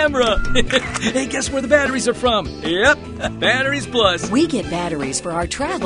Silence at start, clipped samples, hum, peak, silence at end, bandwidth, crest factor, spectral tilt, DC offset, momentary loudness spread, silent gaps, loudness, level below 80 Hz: 0 s; under 0.1%; none; 0 dBFS; 0 s; 10.5 kHz; 18 dB; -3.5 dB/octave; under 0.1%; 6 LU; none; -18 LUFS; -32 dBFS